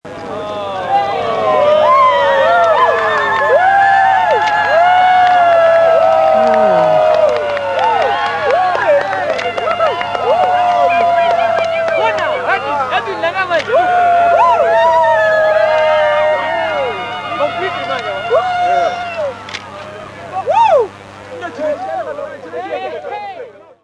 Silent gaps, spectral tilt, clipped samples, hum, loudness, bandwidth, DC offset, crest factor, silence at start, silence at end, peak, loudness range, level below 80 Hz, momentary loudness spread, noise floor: none; -4 dB/octave; under 0.1%; none; -12 LUFS; 11 kHz; under 0.1%; 12 dB; 0.05 s; 0.3 s; 0 dBFS; 8 LU; -52 dBFS; 14 LU; -33 dBFS